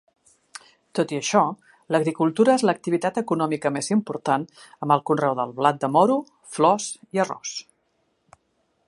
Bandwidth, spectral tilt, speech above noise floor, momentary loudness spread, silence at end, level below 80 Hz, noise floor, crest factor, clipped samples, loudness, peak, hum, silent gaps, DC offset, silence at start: 11.5 kHz; -5 dB/octave; 48 dB; 16 LU; 1.25 s; -72 dBFS; -70 dBFS; 20 dB; under 0.1%; -23 LUFS; -4 dBFS; none; none; under 0.1%; 0.95 s